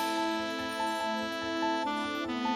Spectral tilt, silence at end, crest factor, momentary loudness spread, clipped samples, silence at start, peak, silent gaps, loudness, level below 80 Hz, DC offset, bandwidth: -3 dB/octave; 0 s; 12 dB; 3 LU; under 0.1%; 0 s; -20 dBFS; none; -32 LUFS; -64 dBFS; under 0.1%; 17.5 kHz